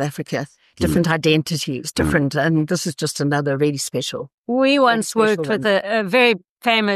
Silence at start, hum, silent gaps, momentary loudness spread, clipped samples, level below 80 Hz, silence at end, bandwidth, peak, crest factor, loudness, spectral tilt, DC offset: 0 s; none; 4.34-4.44 s, 6.49-6.57 s; 9 LU; under 0.1%; -44 dBFS; 0 s; 13.5 kHz; -4 dBFS; 16 dB; -19 LUFS; -4.5 dB/octave; under 0.1%